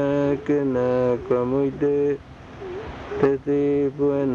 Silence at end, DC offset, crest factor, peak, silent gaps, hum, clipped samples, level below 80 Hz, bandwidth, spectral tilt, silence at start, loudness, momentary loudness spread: 0 s; under 0.1%; 14 dB; -8 dBFS; none; none; under 0.1%; -50 dBFS; 7 kHz; -9 dB/octave; 0 s; -22 LUFS; 13 LU